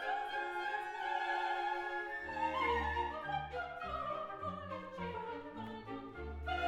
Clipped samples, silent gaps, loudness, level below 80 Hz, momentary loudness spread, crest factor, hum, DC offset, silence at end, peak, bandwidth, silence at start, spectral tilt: under 0.1%; none; -40 LUFS; -54 dBFS; 10 LU; 16 dB; none; under 0.1%; 0 s; -24 dBFS; 13.5 kHz; 0 s; -5.5 dB/octave